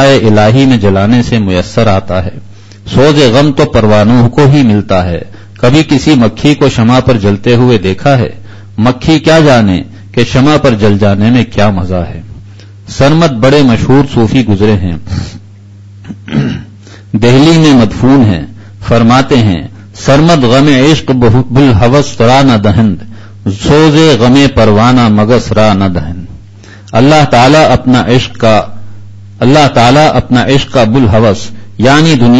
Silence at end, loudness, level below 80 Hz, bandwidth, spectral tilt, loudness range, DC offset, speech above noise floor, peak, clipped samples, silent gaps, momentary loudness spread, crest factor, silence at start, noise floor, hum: 0 s; -7 LUFS; -28 dBFS; 11 kHz; -6.5 dB/octave; 2 LU; under 0.1%; 26 dB; 0 dBFS; 2%; none; 12 LU; 6 dB; 0 s; -32 dBFS; none